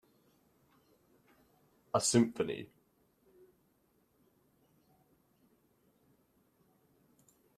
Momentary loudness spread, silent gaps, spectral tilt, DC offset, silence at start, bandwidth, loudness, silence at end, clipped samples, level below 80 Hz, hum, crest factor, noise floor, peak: 16 LU; none; -4.5 dB/octave; under 0.1%; 1.95 s; 13.5 kHz; -32 LUFS; 4.9 s; under 0.1%; -78 dBFS; none; 26 dB; -74 dBFS; -14 dBFS